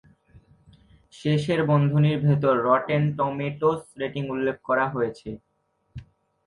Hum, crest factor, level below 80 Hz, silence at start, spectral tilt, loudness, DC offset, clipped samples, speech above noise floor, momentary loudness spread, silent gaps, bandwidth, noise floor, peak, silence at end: none; 18 dB; -58 dBFS; 1.15 s; -8 dB/octave; -24 LUFS; under 0.1%; under 0.1%; 33 dB; 18 LU; none; 11 kHz; -56 dBFS; -8 dBFS; 0.45 s